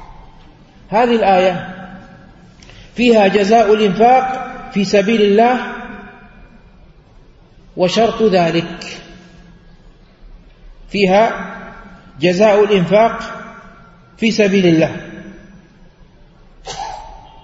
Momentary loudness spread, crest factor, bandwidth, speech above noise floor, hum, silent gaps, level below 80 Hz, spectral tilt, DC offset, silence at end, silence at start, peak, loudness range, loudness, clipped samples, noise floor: 21 LU; 16 dB; 8 kHz; 32 dB; none; none; -44 dBFS; -6 dB/octave; under 0.1%; 0.25 s; 0 s; 0 dBFS; 6 LU; -13 LUFS; under 0.1%; -44 dBFS